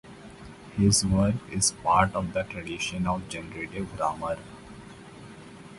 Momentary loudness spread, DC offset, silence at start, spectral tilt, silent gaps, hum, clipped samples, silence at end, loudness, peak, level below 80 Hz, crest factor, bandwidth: 24 LU; under 0.1%; 0.05 s; -4 dB/octave; none; none; under 0.1%; 0 s; -27 LUFS; -6 dBFS; -46 dBFS; 22 dB; 11.5 kHz